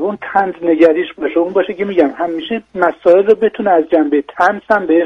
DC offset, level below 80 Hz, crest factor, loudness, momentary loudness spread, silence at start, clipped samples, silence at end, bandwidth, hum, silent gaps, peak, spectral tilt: under 0.1%; -56 dBFS; 14 dB; -14 LUFS; 7 LU; 0 s; under 0.1%; 0 s; 6.6 kHz; none; none; 0 dBFS; -7 dB/octave